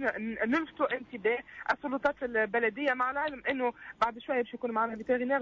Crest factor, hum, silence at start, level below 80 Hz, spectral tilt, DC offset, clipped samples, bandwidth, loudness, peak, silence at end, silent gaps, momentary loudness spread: 14 dB; none; 0 s; -66 dBFS; -5.5 dB/octave; under 0.1%; under 0.1%; 7.4 kHz; -31 LUFS; -16 dBFS; 0 s; none; 4 LU